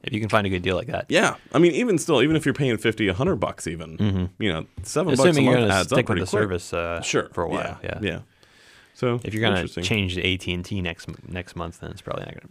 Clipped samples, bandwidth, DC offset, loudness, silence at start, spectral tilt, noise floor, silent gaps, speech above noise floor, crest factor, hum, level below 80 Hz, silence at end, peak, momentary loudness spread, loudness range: under 0.1%; 15.5 kHz; under 0.1%; -23 LUFS; 0.05 s; -5 dB/octave; -53 dBFS; none; 30 dB; 18 dB; none; -50 dBFS; 0.05 s; -4 dBFS; 14 LU; 5 LU